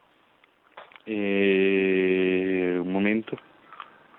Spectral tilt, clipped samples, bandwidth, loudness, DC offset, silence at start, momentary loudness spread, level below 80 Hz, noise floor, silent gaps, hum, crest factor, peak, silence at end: -9.5 dB/octave; under 0.1%; 4 kHz; -24 LUFS; under 0.1%; 0.75 s; 23 LU; -70 dBFS; -62 dBFS; none; none; 16 dB; -10 dBFS; 0.45 s